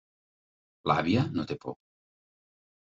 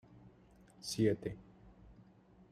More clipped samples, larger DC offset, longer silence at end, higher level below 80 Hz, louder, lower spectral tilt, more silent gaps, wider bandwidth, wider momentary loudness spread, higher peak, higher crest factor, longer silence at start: neither; neither; first, 1.15 s vs 0.6 s; about the same, -60 dBFS vs -64 dBFS; first, -29 LUFS vs -37 LUFS; first, -7.5 dB/octave vs -5.5 dB/octave; neither; second, 7.8 kHz vs 14.5 kHz; second, 16 LU vs 21 LU; first, -10 dBFS vs -20 dBFS; about the same, 24 dB vs 22 dB; first, 0.85 s vs 0.15 s